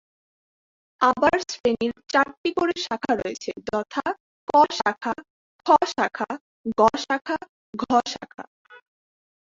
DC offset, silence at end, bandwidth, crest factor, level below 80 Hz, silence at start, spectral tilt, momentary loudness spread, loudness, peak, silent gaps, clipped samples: under 0.1%; 0.7 s; 7.8 kHz; 22 dB; -60 dBFS; 1 s; -3.5 dB/octave; 14 LU; -23 LUFS; -4 dBFS; 1.60-1.64 s, 2.37-2.44 s, 4.20-4.47 s, 5.30-5.59 s, 6.41-6.64 s, 7.49-7.73 s, 8.47-8.65 s; under 0.1%